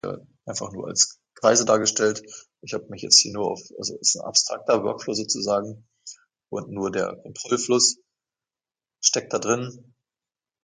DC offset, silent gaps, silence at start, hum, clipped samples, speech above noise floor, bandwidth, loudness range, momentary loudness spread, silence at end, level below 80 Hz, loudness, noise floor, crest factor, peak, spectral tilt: under 0.1%; none; 0.05 s; none; under 0.1%; over 66 dB; 11 kHz; 5 LU; 19 LU; 0.85 s; -66 dBFS; -22 LUFS; under -90 dBFS; 24 dB; 0 dBFS; -2 dB/octave